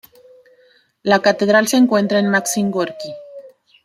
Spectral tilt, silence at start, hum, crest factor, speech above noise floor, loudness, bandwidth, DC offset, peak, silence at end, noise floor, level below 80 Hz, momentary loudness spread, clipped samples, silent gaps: -4 dB/octave; 1.05 s; none; 16 dB; 39 dB; -16 LUFS; 15.5 kHz; under 0.1%; -2 dBFS; 0.35 s; -55 dBFS; -64 dBFS; 15 LU; under 0.1%; none